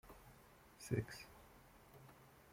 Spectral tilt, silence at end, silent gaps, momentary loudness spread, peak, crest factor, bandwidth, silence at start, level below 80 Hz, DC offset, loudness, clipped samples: -6 dB/octave; 0 s; none; 21 LU; -26 dBFS; 26 dB; 16.5 kHz; 0.05 s; -70 dBFS; under 0.1%; -47 LUFS; under 0.1%